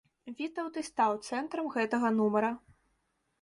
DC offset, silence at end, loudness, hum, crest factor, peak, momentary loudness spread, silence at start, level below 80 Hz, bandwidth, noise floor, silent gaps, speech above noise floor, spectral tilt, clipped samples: under 0.1%; 0.85 s; -32 LUFS; none; 18 dB; -16 dBFS; 11 LU; 0.25 s; -74 dBFS; 11.5 kHz; -77 dBFS; none; 46 dB; -5.5 dB/octave; under 0.1%